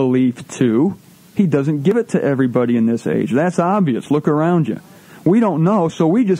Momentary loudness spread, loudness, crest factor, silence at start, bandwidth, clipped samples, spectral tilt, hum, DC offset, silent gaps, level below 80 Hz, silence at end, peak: 5 LU; -17 LUFS; 14 dB; 0 s; 11.5 kHz; under 0.1%; -8 dB/octave; none; under 0.1%; none; -62 dBFS; 0 s; -2 dBFS